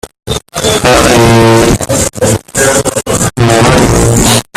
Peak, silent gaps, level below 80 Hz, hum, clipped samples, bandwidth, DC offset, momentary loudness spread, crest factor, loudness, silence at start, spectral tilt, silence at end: 0 dBFS; none; -24 dBFS; none; 0.4%; 16.5 kHz; under 0.1%; 7 LU; 8 dB; -8 LUFS; 0.05 s; -4 dB/octave; 0.15 s